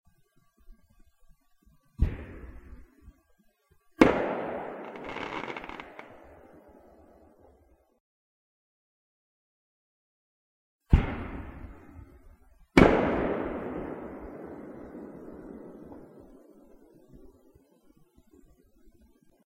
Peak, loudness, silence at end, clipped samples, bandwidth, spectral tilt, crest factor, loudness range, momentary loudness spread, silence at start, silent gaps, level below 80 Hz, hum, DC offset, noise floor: -4 dBFS; -28 LUFS; 2.3 s; under 0.1%; 15.5 kHz; -7.5 dB/octave; 28 dB; 20 LU; 26 LU; 0.7 s; 8.00-10.79 s; -42 dBFS; none; under 0.1%; -67 dBFS